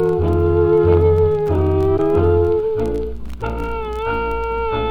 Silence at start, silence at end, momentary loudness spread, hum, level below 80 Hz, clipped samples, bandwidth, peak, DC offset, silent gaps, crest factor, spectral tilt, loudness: 0 s; 0 s; 11 LU; none; -30 dBFS; under 0.1%; 5.2 kHz; -2 dBFS; under 0.1%; none; 14 dB; -9.5 dB/octave; -17 LUFS